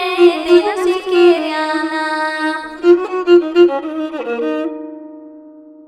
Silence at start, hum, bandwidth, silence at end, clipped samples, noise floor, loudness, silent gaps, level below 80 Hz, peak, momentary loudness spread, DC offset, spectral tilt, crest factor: 0 s; none; 10.5 kHz; 0.25 s; under 0.1%; -39 dBFS; -14 LUFS; none; -58 dBFS; 0 dBFS; 11 LU; under 0.1%; -4 dB/octave; 14 dB